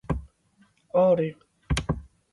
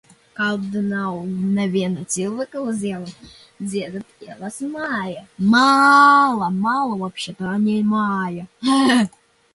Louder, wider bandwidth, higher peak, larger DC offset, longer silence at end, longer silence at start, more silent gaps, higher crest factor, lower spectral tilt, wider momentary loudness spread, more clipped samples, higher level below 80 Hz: second, -26 LUFS vs -19 LUFS; about the same, 11.5 kHz vs 11.5 kHz; second, -10 dBFS vs -2 dBFS; neither; second, 0.3 s vs 0.45 s; second, 0.1 s vs 0.4 s; neither; about the same, 18 dB vs 18 dB; first, -6.5 dB/octave vs -5 dB/octave; second, 12 LU vs 18 LU; neither; first, -38 dBFS vs -60 dBFS